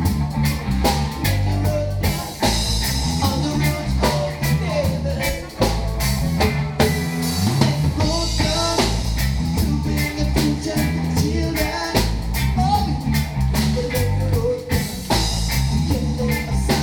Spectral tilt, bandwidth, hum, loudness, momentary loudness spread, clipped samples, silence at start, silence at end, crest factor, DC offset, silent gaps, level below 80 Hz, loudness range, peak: -5 dB/octave; 19 kHz; none; -20 LUFS; 3 LU; under 0.1%; 0 s; 0 s; 18 dB; under 0.1%; none; -26 dBFS; 1 LU; 0 dBFS